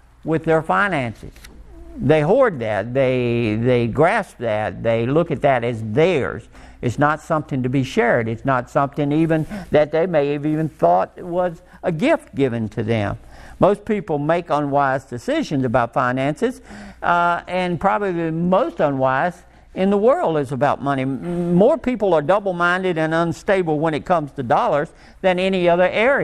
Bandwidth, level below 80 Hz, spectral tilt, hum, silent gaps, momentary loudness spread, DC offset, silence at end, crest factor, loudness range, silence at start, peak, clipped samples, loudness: 12.5 kHz; -46 dBFS; -7 dB/octave; none; none; 7 LU; under 0.1%; 0 s; 18 dB; 2 LU; 0.25 s; 0 dBFS; under 0.1%; -19 LUFS